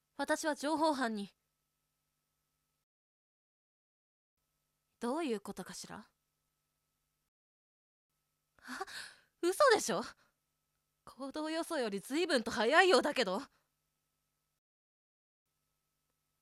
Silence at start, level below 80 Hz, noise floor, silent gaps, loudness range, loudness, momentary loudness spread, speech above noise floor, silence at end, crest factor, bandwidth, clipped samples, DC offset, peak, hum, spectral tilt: 0.2 s; -78 dBFS; -85 dBFS; 2.83-4.37 s, 7.28-8.10 s; 18 LU; -33 LUFS; 20 LU; 51 dB; 2.95 s; 26 dB; 15.5 kHz; under 0.1%; under 0.1%; -12 dBFS; none; -3 dB/octave